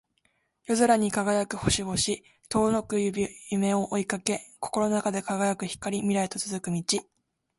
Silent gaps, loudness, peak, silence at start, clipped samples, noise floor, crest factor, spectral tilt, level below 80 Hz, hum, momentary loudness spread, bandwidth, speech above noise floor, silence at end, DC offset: none; -27 LUFS; -4 dBFS; 0.7 s; under 0.1%; -72 dBFS; 24 dB; -4 dB/octave; -54 dBFS; none; 7 LU; 12 kHz; 45 dB; 0.55 s; under 0.1%